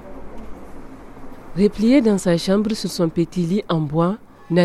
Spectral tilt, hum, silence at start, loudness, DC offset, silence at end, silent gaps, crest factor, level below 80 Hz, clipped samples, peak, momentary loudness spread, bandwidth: -6.5 dB/octave; none; 0 s; -19 LUFS; under 0.1%; 0 s; none; 16 dB; -42 dBFS; under 0.1%; -4 dBFS; 25 LU; 14 kHz